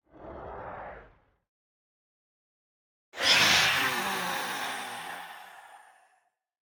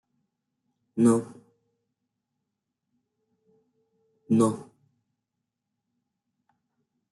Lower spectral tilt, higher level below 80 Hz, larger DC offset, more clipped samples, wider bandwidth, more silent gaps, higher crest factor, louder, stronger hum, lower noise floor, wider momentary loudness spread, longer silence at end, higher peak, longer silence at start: second, -0.5 dB/octave vs -7.5 dB/octave; first, -64 dBFS vs -76 dBFS; neither; neither; first, over 20 kHz vs 11.5 kHz; first, 1.48-3.12 s vs none; about the same, 24 dB vs 22 dB; about the same, -25 LUFS vs -24 LUFS; neither; second, -72 dBFS vs -84 dBFS; first, 25 LU vs 17 LU; second, 0.85 s vs 2.5 s; about the same, -8 dBFS vs -10 dBFS; second, 0.15 s vs 0.95 s